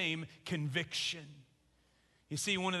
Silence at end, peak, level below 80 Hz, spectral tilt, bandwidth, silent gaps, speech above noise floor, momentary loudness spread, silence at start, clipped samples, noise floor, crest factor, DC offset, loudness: 0 s; -20 dBFS; -72 dBFS; -3.5 dB/octave; 12 kHz; none; 34 dB; 11 LU; 0 s; under 0.1%; -72 dBFS; 20 dB; under 0.1%; -37 LUFS